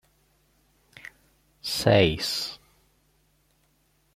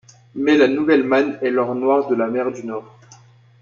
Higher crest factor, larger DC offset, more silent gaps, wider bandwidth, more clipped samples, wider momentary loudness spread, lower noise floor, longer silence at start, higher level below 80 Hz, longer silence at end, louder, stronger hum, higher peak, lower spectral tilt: first, 24 dB vs 16 dB; neither; neither; first, 16 kHz vs 7.2 kHz; neither; first, 26 LU vs 14 LU; first, -67 dBFS vs -48 dBFS; first, 1.05 s vs 0.35 s; first, -54 dBFS vs -64 dBFS; first, 1.6 s vs 0.45 s; second, -24 LUFS vs -18 LUFS; neither; about the same, -4 dBFS vs -4 dBFS; second, -4.5 dB/octave vs -6 dB/octave